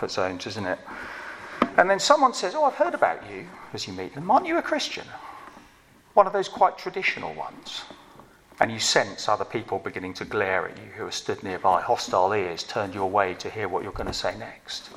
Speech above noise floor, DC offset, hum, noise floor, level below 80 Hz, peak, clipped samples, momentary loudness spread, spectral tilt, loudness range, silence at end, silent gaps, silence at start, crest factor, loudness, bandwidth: 29 dB; under 0.1%; none; -55 dBFS; -54 dBFS; 0 dBFS; under 0.1%; 15 LU; -3 dB/octave; 3 LU; 0 s; none; 0 s; 26 dB; -25 LUFS; 15 kHz